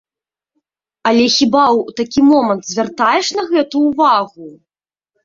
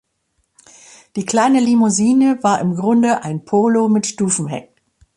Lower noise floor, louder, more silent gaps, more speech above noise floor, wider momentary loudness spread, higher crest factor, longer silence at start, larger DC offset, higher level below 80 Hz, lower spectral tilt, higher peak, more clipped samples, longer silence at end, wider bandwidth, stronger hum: first, -89 dBFS vs -67 dBFS; first, -13 LUFS vs -16 LUFS; neither; first, 76 dB vs 52 dB; about the same, 7 LU vs 9 LU; about the same, 14 dB vs 14 dB; about the same, 1.05 s vs 1.15 s; neither; first, -54 dBFS vs -60 dBFS; second, -3.5 dB/octave vs -5 dB/octave; about the same, -2 dBFS vs -2 dBFS; neither; first, 0.75 s vs 0.55 s; second, 7.6 kHz vs 11.5 kHz; neither